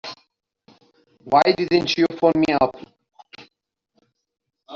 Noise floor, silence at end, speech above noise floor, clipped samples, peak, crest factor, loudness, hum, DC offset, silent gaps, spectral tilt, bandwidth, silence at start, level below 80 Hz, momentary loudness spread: -74 dBFS; 0 s; 56 dB; under 0.1%; -2 dBFS; 20 dB; -19 LUFS; none; under 0.1%; none; -3.5 dB/octave; 7.4 kHz; 0.05 s; -58 dBFS; 5 LU